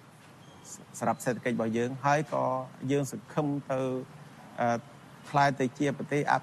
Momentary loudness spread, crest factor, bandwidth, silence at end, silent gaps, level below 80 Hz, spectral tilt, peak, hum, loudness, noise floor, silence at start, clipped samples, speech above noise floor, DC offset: 19 LU; 20 dB; 13 kHz; 0 s; none; -70 dBFS; -6 dB/octave; -10 dBFS; none; -30 LUFS; -53 dBFS; 0.05 s; under 0.1%; 23 dB; under 0.1%